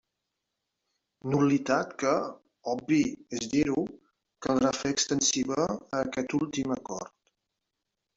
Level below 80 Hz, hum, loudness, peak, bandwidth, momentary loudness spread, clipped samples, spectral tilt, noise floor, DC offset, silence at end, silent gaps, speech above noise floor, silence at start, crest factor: -62 dBFS; none; -28 LUFS; -12 dBFS; 7.8 kHz; 13 LU; under 0.1%; -4 dB/octave; -84 dBFS; under 0.1%; 1.1 s; none; 56 dB; 1.25 s; 18 dB